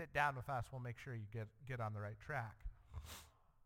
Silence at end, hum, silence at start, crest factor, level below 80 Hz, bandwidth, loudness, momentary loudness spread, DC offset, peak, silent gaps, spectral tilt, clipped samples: 0.35 s; none; 0 s; 24 dB; -60 dBFS; 16.5 kHz; -46 LUFS; 16 LU; under 0.1%; -22 dBFS; none; -5.5 dB/octave; under 0.1%